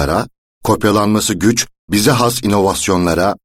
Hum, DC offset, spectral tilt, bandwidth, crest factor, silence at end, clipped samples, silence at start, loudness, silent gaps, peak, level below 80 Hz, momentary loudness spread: none; under 0.1%; -4.5 dB/octave; 16.5 kHz; 14 dB; 0.1 s; under 0.1%; 0 s; -14 LUFS; 0.38-0.61 s, 1.79-1.88 s; 0 dBFS; -36 dBFS; 5 LU